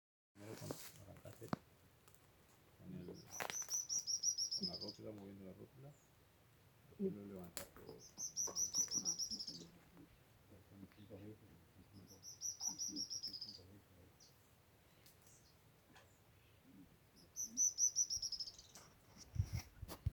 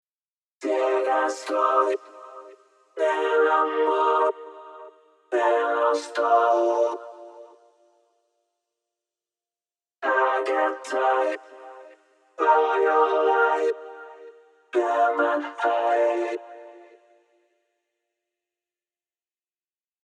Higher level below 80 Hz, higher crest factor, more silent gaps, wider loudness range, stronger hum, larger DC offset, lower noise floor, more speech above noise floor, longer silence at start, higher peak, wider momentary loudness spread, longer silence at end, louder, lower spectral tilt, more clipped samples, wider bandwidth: first, -68 dBFS vs -90 dBFS; first, 28 dB vs 18 dB; neither; first, 12 LU vs 7 LU; neither; neither; second, -70 dBFS vs under -90 dBFS; second, 23 dB vs over 68 dB; second, 0.35 s vs 0.6 s; second, -20 dBFS vs -8 dBFS; first, 25 LU vs 22 LU; second, 0 s vs 3.25 s; second, -42 LUFS vs -23 LUFS; about the same, -2 dB/octave vs -1.5 dB/octave; neither; first, over 20 kHz vs 11 kHz